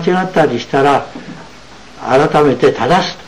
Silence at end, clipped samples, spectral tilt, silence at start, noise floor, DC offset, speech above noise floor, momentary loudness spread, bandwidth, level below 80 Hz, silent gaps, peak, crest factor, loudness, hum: 0 s; under 0.1%; -6 dB/octave; 0 s; -37 dBFS; 1%; 25 dB; 19 LU; 12 kHz; -44 dBFS; none; -2 dBFS; 12 dB; -12 LUFS; none